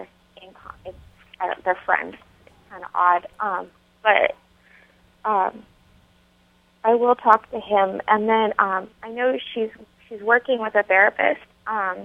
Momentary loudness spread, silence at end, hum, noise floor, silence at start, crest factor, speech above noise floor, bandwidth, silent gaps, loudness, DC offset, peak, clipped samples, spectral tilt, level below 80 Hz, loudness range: 18 LU; 0 s; none; -59 dBFS; 0 s; 22 dB; 38 dB; 6.2 kHz; none; -21 LUFS; under 0.1%; 0 dBFS; under 0.1%; -6 dB/octave; -60 dBFS; 5 LU